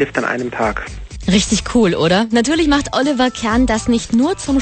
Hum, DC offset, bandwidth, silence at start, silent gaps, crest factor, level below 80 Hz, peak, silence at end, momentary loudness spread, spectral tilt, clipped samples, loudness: none; under 0.1%; 8.8 kHz; 0 s; none; 14 dB; -32 dBFS; -2 dBFS; 0 s; 6 LU; -4.5 dB/octave; under 0.1%; -16 LUFS